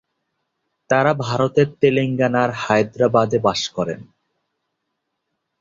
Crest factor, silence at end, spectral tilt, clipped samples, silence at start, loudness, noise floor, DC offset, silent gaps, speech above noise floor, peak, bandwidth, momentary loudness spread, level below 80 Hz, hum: 18 dB; 1.6 s; -6 dB/octave; under 0.1%; 0.9 s; -18 LUFS; -76 dBFS; under 0.1%; none; 58 dB; -2 dBFS; 7.8 kHz; 7 LU; -56 dBFS; none